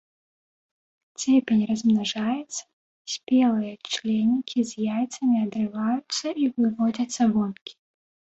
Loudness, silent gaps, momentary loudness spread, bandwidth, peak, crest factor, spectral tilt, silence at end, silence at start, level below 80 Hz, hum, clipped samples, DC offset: -24 LUFS; 2.73-3.05 s, 7.61-7.66 s; 12 LU; 8.2 kHz; -10 dBFS; 16 dB; -4.5 dB/octave; 0.6 s; 1.2 s; -66 dBFS; none; under 0.1%; under 0.1%